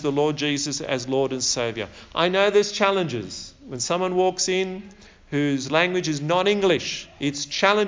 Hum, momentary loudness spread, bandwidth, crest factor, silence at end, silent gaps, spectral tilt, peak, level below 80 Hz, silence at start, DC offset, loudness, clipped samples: none; 10 LU; 7.8 kHz; 20 dB; 0 s; none; -3.5 dB/octave; -4 dBFS; -56 dBFS; 0 s; under 0.1%; -23 LUFS; under 0.1%